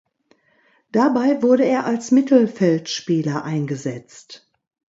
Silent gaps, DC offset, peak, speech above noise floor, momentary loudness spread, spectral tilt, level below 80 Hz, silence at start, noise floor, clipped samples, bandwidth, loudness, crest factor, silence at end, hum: none; under 0.1%; -2 dBFS; 42 dB; 10 LU; -6 dB/octave; -68 dBFS; 0.95 s; -61 dBFS; under 0.1%; 7.8 kHz; -19 LUFS; 16 dB; 0.6 s; none